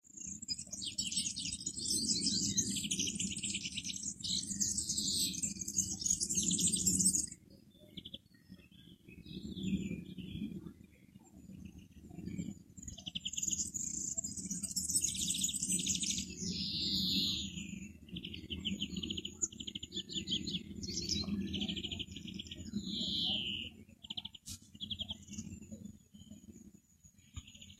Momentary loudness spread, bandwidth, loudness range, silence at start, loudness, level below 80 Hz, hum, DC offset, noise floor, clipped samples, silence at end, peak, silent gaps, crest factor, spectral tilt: 20 LU; 15 kHz; 12 LU; 0.05 s; -36 LUFS; -60 dBFS; none; under 0.1%; -64 dBFS; under 0.1%; 0.05 s; -16 dBFS; none; 24 dB; -1.5 dB/octave